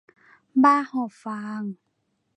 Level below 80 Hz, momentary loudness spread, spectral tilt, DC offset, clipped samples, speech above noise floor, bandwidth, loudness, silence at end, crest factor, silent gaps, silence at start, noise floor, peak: -80 dBFS; 15 LU; -6.5 dB/octave; under 0.1%; under 0.1%; 51 dB; 9 kHz; -23 LUFS; 0.6 s; 20 dB; none; 0.55 s; -73 dBFS; -6 dBFS